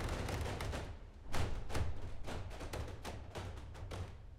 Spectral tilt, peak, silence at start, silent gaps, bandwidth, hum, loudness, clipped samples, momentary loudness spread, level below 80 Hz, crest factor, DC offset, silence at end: -5 dB/octave; -24 dBFS; 0 s; none; 15.5 kHz; none; -45 LUFS; under 0.1%; 8 LU; -46 dBFS; 18 dB; under 0.1%; 0 s